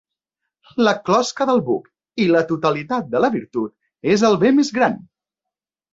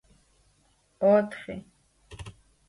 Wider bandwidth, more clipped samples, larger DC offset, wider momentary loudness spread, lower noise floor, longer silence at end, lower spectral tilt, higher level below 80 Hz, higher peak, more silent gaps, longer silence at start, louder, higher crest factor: second, 8 kHz vs 11.5 kHz; neither; neither; second, 11 LU vs 23 LU; first, -86 dBFS vs -66 dBFS; first, 0.95 s vs 0.4 s; second, -5.5 dB/octave vs -7.5 dB/octave; about the same, -60 dBFS vs -58 dBFS; first, -2 dBFS vs -10 dBFS; neither; second, 0.75 s vs 1 s; first, -18 LUFS vs -25 LUFS; about the same, 16 dB vs 20 dB